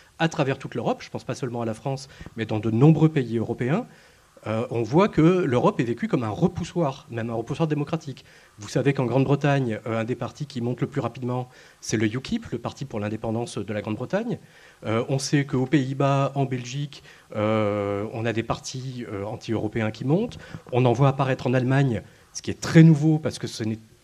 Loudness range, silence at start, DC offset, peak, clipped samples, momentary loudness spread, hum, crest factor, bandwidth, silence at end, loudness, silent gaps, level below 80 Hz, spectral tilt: 7 LU; 0.2 s; under 0.1%; -2 dBFS; under 0.1%; 13 LU; none; 22 dB; 11 kHz; 0.25 s; -24 LUFS; none; -56 dBFS; -7 dB/octave